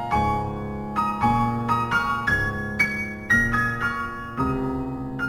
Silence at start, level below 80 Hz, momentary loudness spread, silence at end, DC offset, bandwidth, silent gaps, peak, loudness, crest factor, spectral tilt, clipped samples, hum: 0 s; -38 dBFS; 9 LU; 0 s; under 0.1%; 16.5 kHz; none; -8 dBFS; -24 LUFS; 16 dB; -6 dB/octave; under 0.1%; none